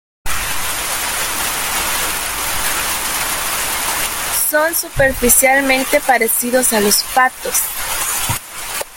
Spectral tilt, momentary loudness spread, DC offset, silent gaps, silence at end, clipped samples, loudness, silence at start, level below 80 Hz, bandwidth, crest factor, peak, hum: -1.5 dB/octave; 7 LU; under 0.1%; none; 0 s; under 0.1%; -15 LUFS; 0.25 s; -36 dBFS; 17 kHz; 16 dB; 0 dBFS; none